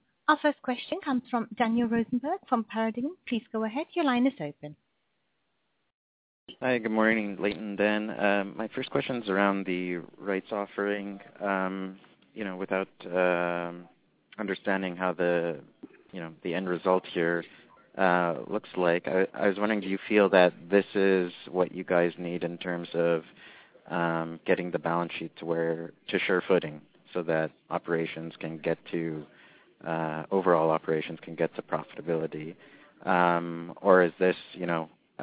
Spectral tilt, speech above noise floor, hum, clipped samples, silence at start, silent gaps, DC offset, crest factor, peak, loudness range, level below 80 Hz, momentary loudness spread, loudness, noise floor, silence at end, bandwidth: -10 dB/octave; 49 dB; none; under 0.1%; 0.3 s; 5.94-6.47 s; under 0.1%; 24 dB; -6 dBFS; 6 LU; -68 dBFS; 12 LU; -29 LUFS; -77 dBFS; 0 s; 4 kHz